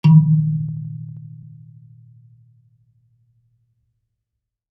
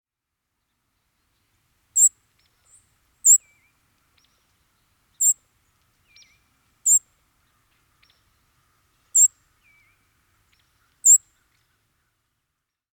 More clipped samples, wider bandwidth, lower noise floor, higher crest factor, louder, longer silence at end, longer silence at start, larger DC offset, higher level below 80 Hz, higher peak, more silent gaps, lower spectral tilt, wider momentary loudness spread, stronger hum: neither; second, 4.9 kHz vs 19.5 kHz; about the same, -80 dBFS vs -82 dBFS; about the same, 20 dB vs 22 dB; about the same, -18 LUFS vs -17 LUFS; first, 3.35 s vs 1.75 s; second, 0.05 s vs 1.95 s; neither; about the same, -70 dBFS vs -74 dBFS; about the same, -2 dBFS vs -4 dBFS; neither; first, -10.5 dB/octave vs 3.5 dB/octave; first, 29 LU vs 7 LU; neither